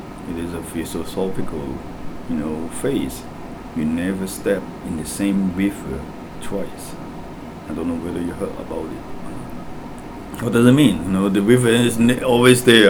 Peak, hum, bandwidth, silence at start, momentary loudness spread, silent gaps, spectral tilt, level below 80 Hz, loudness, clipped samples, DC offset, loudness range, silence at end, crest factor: 0 dBFS; none; over 20 kHz; 0 s; 20 LU; none; -5 dB/octave; -40 dBFS; -20 LUFS; under 0.1%; under 0.1%; 11 LU; 0 s; 20 dB